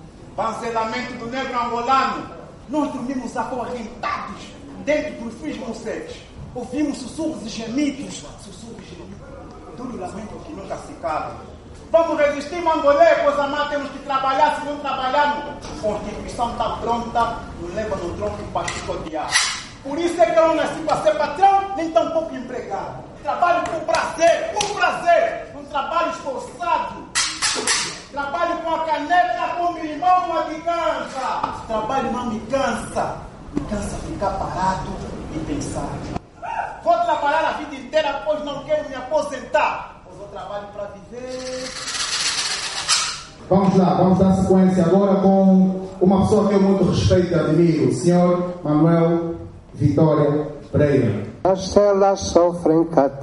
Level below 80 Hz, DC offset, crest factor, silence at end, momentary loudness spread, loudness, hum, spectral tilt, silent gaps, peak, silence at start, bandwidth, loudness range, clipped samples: -44 dBFS; under 0.1%; 20 dB; 0 s; 16 LU; -20 LUFS; none; -5 dB/octave; none; 0 dBFS; 0 s; 11.5 kHz; 10 LU; under 0.1%